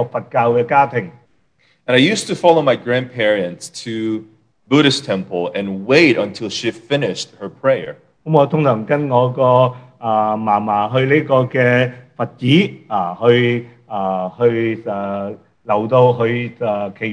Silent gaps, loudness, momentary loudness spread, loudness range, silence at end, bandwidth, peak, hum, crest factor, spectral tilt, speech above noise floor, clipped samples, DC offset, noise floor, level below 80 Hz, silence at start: none; -16 LUFS; 12 LU; 3 LU; 0 s; 10.5 kHz; 0 dBFS; none; 16 dB; -6 dB/octave; 43 dB; under 0.1%; under 0.1%; -59 dBFS; -62 dBFS; 0 s